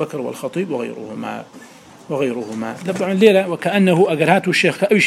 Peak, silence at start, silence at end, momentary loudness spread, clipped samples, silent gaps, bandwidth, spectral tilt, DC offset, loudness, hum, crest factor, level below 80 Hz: 0 dBFS; 0 s; 0 s; 15 LU; under 0.1%; none; 14 kHz; -5.5 dB/octave; under 0.1%; -17 LUFS; none; 18 dB; -68 dBFS